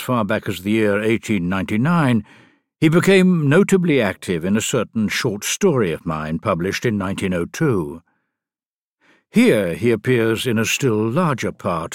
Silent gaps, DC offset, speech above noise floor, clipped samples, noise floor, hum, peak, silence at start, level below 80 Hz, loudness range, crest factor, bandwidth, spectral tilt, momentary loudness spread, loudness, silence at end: 8.66-8.98 s; under 0.1%; over 72 dB; under 0.1%; under -90 dBFS; none; -2 dBFS; 0 s; -52 dBFS; 5 LU; 16 dB; 17 kHz; -5.5 dB/octave; 8 LU; -18 LUFS; 0 s